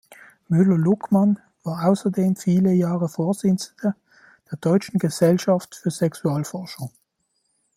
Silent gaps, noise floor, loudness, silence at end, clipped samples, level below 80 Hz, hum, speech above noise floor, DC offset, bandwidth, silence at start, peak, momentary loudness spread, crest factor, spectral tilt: none; -72 dBFS; -21 LUFS; 0.9 s; under 0.1%; -64 dBFS; none; 52 dB; under 0.1%; 15 kHz; 0.1 s; -4 dBFS; 13 LU; 16 dB; -7.5 dB/octave